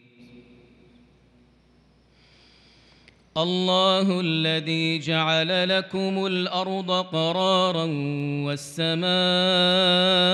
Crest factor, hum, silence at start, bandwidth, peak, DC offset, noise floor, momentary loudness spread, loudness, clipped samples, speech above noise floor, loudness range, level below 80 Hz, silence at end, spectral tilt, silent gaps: 16 dB; none; 0.2 s; 12 kHz; -8 dBFS; under 0.1%; -59 dBFS; 9 LU; -22 LUFS; under 0.1%; 36 dB; 5 LU; -68 dBFS; 0 s; -5 dB/octave; none